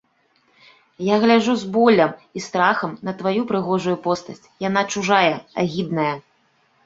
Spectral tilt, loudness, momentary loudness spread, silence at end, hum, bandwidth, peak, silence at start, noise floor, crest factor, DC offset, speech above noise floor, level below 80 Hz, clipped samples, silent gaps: -5 dB/octave; -20 LUFS; 11 LU; 0.65 s; none; 7.8 kHz; -2 dBFS; 1 s; -62 dBFS; 20 dB; under 0.1%; 43 dB; -62 dBFS; under 0.1%; none